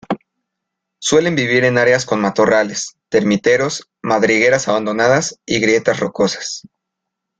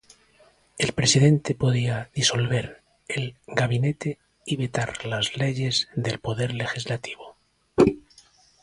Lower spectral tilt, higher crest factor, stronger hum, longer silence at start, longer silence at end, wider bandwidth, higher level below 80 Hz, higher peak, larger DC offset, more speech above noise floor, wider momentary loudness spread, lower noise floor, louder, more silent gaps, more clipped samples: about the same, -4 dB/octave vs -4.5 dB/octave; second, 16 dB vs 22 dB; neither; second, 0.1 s vs 0.75 s; first, 0.8 s vs 0.65 s; second, 9.2 kHz vs 11.5 kHz; about the same, -54 dBFS vs -52 dBFS; about the same, 0 dBFS vs -2 dBFS; neither; first, 64 dB vs 34 dB; about the same, 11 LU vs 12 LU; first, -79 dBFS vs -59 dBFS; first, -15 LUFS vs -24 LUFS; neither; neither